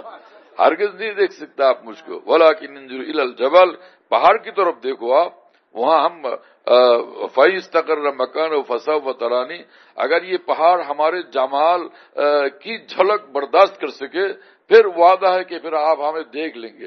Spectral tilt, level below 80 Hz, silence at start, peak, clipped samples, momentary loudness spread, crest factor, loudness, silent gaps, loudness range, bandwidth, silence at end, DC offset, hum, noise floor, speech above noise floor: -4.5 dB/octave; -70 dBFS; 0.05 s; 0 dBFS; under 0.1%; 14 LU; 18 dB; -17 LUFS; none; 3 LU; 6.4 kHz; 0 s; under 0.1%; none; -41 dBFS; 24 dB